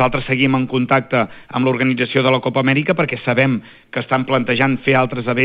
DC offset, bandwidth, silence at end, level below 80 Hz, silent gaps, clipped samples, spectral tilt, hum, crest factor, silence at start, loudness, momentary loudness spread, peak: under 0.1%; 5 kHz; 0 s; -46 dBFS; none; under 0.1%; -9.5 dB/octave; none; 16 dB; 0 s; -17 LUFS; 4 LU; -2 dBFS